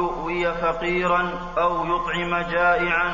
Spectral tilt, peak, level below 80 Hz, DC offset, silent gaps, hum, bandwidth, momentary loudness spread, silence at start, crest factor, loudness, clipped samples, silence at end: -6 dB/octave; -8 dBFS; -40 dBFS; under 0.1%; none; none; 7.4 kHz; 5 LU; 0 s; 14 dB; -22 LUFS; under 0.1%; 0 s